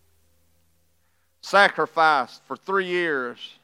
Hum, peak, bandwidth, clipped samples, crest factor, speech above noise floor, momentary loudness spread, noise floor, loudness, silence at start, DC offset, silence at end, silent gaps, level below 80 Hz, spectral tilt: none; -2 dBFS; 14.5 kHz; under 0.1%; 22 dB; 47 dB; 15 LU; -69 dBFS; -21 LUFS; 1.45 s; under 0.1%; 0.15 s; none; -76 dBFS; -3.5 dB/octave